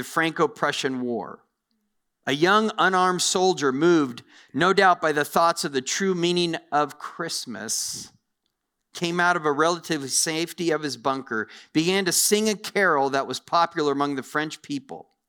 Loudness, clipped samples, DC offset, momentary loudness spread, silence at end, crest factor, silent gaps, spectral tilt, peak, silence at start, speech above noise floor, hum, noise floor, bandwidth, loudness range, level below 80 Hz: -23 LUFS; under 0.1%; under 0.1%; 11 LU; 0.25 s; 20 dB; none; -3 dB/octave; -4 dBFS; 0 s; 54 dB; none; -78 dBFS; over 20 kHz; 5 LU; -70 dBFS